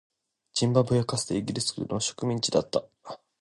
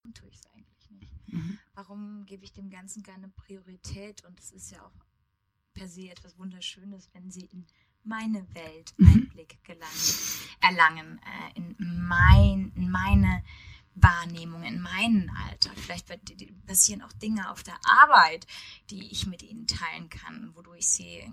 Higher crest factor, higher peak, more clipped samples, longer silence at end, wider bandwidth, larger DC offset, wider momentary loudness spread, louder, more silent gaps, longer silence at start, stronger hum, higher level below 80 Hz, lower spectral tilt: second, 20 dB vs 26 dB; second, -8 dBFS vs -2 dBFS; neither; first, 0.25 s vs 0 s; second, 11.5 kHz vs 16 kHz; neither; second, 11 LU vs 27 LU; second, -27 LUFS vs -23 LUFS; neither; first, 0.55 s vs 0.1 s; neither; second, -58 dBFS vs -34 dBFS; about the same, -5 dB/octave vs -4 dB/octave